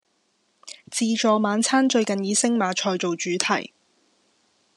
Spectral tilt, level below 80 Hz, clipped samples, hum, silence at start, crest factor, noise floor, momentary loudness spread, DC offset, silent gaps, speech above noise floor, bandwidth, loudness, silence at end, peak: -3 dB/octave; -80 dBFS; under 0.1%; none; 0.65 s; 24 dB; -69 dBFS; 10 LU; under 0.1%; none; 47 dB; 12 kHz; -22 LUFS; 1.15 s; 0 dBFS